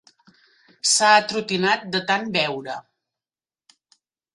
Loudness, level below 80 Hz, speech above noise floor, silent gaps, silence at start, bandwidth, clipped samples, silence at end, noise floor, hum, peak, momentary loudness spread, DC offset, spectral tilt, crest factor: -20 LUFS; -68 dBFS; over 69 dB; none; 0.85 s; 11.5 kHz; under 0.1%; 1.55 s; under -90 dBFS; none; -2 dBFS; 15 LU; under 0.1%; -2 dB/octave; 22 dB